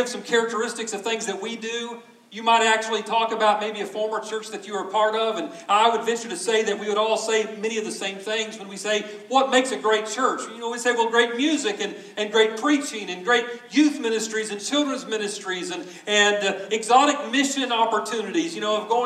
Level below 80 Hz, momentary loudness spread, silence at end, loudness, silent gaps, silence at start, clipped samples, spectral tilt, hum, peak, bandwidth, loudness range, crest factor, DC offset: -86 dBFS; 11 LU; 0 s; -23 LUFS; none; 0 s; under 0.1%; -2 dB/octave; none; -4 dBFS; 14 kHz; 2 LU; 20 dB; under 0.1%